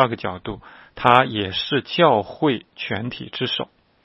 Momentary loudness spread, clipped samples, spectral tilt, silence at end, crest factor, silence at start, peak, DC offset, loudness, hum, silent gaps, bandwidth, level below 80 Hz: 15 LU; under 0.1%; -7.5 dB/octave; 0.4 s; 22 dB; 0 s; 0 dBFS; under 0.1%; -21 LUFS; none; none; 11 kHz; -54 dBFS